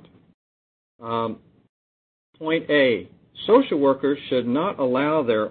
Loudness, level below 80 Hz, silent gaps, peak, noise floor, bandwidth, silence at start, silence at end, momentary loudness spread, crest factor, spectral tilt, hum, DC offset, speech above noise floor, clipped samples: -22 LUFS; -66 dBFS; 1.69-2.33 s; -6 dBFS; under -90 dBFS; 4.5 kHz; 1 s; 0 s; 14 LU; 18 dB; -10 dB/octave; none; under 0.1%; over 69 dB; under 0.1%